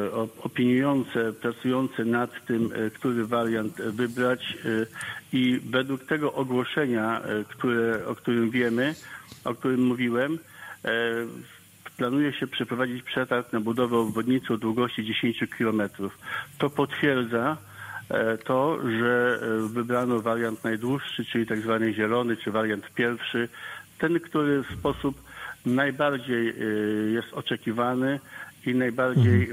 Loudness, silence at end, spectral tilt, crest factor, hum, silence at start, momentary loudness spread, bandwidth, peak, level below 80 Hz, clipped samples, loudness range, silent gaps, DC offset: -27 LUFS; 0 s; -6.5 dB/octave; 18 dB; none; 0 s; 8 LU; 16 kHz; -8 dBFS; -60 dBFS; under 0.1%; 2 LU; none; under 0.1%